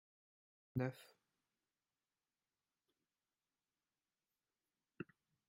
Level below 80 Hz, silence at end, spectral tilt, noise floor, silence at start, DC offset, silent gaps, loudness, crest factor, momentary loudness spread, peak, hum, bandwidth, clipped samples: -82 dBFS; 0.45 s; -8 dB/octave; under -90 dBFS; 0.75 s; under 0.1%; none; -48 LUFS; 26 dB; 18 LU; -28 dBFS; none; 15 kHz; under 0.1%